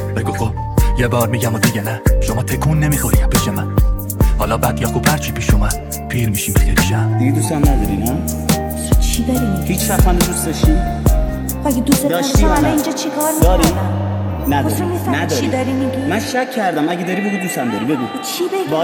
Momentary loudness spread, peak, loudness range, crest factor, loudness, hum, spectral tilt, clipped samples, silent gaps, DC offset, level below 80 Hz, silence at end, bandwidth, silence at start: 5 LU; 0 dBFS; 2 LU; 14 dB; -16 LUFS; none; -5 dB/octave; under 0.1%; none; under 0.1%; -20 dBFS; 0 s; 19 kHz; 0 s